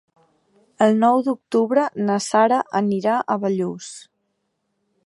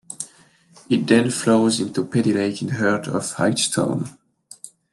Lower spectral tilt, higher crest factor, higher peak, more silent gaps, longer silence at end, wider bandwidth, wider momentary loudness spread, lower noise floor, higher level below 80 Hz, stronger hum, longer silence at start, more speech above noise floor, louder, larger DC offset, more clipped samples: about the same, -5.5 dB/octave vs -4.5 dB/octave; about the same, 18 dB vs 20 dB; about the same, -2 dBFS vs -2 dBFS; neither; first, 1.05 s vs 0.25 s; about the same, 11.5 kHz vs 12.5 kHz; second, 10 LU vs 17 LU; first, -73 dBFS vs -53 dBFS; second, -72 dBFS vs -64 dBFS; neither; first, 0.8 s vs 0.1 s; first, 54 dB vs 33 dB; about the same, -20 LUFS vs -20 LUFS; neither; neither